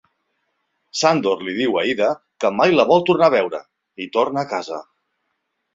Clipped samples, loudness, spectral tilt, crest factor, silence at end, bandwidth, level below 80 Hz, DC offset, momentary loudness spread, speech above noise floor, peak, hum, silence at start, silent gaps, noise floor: under 0.1%; -18 LUFS; -4.5 dB/octave; 18 dB; 0.95 s; 7.8 kHz; -64 dBFS; under 0.1%; 14 LU; 56 dB; -2 dBFS; none; 0.95 s; none; -74 dBFS